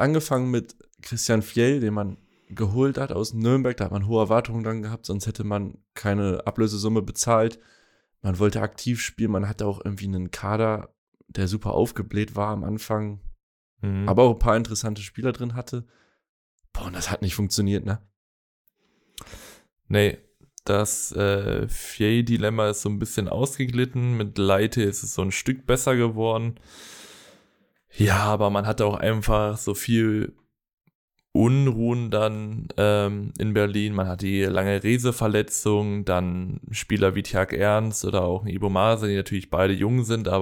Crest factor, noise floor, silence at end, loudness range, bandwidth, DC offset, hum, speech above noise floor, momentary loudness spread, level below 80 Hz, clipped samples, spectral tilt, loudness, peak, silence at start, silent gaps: 20 dB; -66 dBFS; 0 s; 5 LU; 18 kHz; under 0.1%; none; 43 dB; 10 LU; -42 dBFS; under 0.1%; -5.5 dB/octave; -24 LUFS; -4 dBFS; 0 s; 10.98-11.12 s, 13.43-13.77 s, 16.29-16.58 s, 18.16-18.65 s, 30.73-30.77 s, 30.95-31.08 s